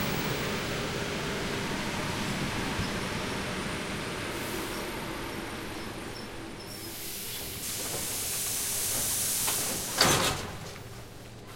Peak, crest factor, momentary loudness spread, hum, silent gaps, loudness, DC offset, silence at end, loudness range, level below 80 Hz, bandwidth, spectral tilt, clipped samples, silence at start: -6 dBFS; 26 dB; 13 LU; none; none; -31 LUFS; under 0.1%; 0 s; 9 LU; -50 dBFS; 16.5 kHz; -2.5 dB/octave; under 0.1%; 0 s